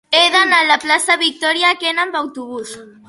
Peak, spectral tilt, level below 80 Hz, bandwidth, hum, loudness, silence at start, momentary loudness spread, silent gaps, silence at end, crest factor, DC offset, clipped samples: 0 dBFS; 0 dB/octave; -66 dBFS; 12 kHz; none; -13 LUFS; 0.1 s; 17 LU; none; 0.2 s; 16 dB; under 0.1%; under 0.1%